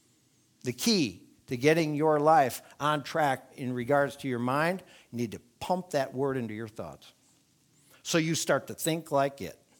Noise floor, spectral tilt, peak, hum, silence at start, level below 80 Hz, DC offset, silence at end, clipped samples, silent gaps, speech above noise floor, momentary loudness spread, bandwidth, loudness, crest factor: -67 dBFS; -4.5 dB/octave; -8 dBFS; none; 0.65 s; -70 dBFS; under 0.1%; 0.25 s; under 0.1%; none; 38 dB; 14 LU; 19.5 kHz; -29 LUFS; 22 dB